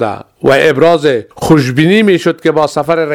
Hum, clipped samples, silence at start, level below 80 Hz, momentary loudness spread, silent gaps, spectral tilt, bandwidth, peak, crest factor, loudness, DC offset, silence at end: none; 0.5%; 0 s; -44 dBFS; 6 LU; none; -6 dB/octave; 16 kHz; 0 dBFS; 10 dB; -10 LUFS; under 0.1%; 0 s